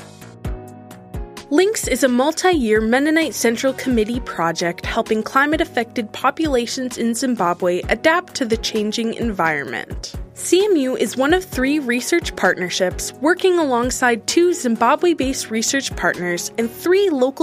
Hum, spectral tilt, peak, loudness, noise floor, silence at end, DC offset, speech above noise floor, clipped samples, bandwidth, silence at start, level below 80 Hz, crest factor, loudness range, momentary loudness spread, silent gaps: none; -3.5 dB/octave; -2 dBFS; -18 LUFS; -38 dBFS; 0 s; under 0.1%; 20 dB; under 0.1%; 15.5 kHz; 0 s; -38 dBFS; 18 dB; 2 LU; 8 LU; none